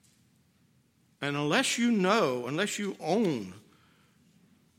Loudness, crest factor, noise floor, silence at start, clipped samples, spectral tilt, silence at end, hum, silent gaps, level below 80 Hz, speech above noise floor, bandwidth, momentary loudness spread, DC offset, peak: -28 LUFS; 22 dB; -67 dBFS; 1.2 s; under 0.1%; -4 dB/octave; 1.2 s; none; none; -80 dBFS; 39 dB; 16.5 kHz; 10 LU; under 0.1%; -10 dBFS